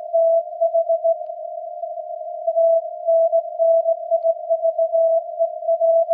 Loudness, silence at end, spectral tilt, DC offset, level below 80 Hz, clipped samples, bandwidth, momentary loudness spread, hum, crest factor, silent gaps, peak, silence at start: -19 LUFS; 0 s; -5 dB/octave; under 0.1%; under -90 dBFS; under 0.1%; 0.8 kHz; 13 LU; none; 10 dB; none; -10 dBFS; 0 s